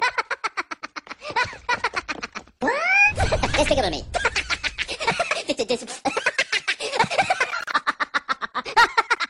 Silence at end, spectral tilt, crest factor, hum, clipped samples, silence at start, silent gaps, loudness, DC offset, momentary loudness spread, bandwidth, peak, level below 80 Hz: 0.05 s; -3 dB/octave; 20 dB; none; under 0.1%; 0 s; none; -22 LUFS; under 0.1%; 11 LU; 15.5 kHz; -4 dBFS; -40 dBFS